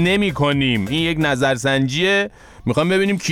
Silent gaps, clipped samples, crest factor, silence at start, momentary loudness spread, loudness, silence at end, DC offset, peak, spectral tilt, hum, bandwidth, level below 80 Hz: none; under 0.1%; 12 dB; 0 s; 3 LU; -18 LUFS; 0 s; under 0.1%; -6 dBFS; -5 dB/octave; none; 16.5 kHz; -42 dBFS